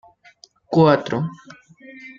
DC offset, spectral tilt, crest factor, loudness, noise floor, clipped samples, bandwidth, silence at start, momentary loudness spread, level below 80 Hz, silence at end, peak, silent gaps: under 0.1%; -8 dB/octave; 20 dB; -19 LUFS; -52 dBFS; under 0.1%; 7.2 kHz; 0.7 s; 16 LU; -60 dBFS; 0.05 s; -2 dBFS; none